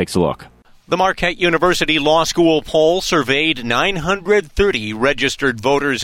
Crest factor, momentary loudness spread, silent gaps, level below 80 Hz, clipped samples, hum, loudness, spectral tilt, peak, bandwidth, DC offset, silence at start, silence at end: 14 dB; 4 LU; none; -36 dBFS; under 0.1%; none; -16 LUFS; -4 dB/octave; -2 dBFS; 16.5 kHz; under 0.1%; 0 s; 0 s